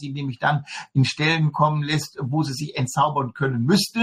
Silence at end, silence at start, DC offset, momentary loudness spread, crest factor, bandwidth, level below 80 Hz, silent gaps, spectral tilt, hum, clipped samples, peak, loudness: 0 s; 0 s; under 0.1%; 7 LU; 16 dB; 16 kHz; -60 dBFS; none; -5.5 dB/octave; none; under 0.1%; -6 dBFS; -22 LUFS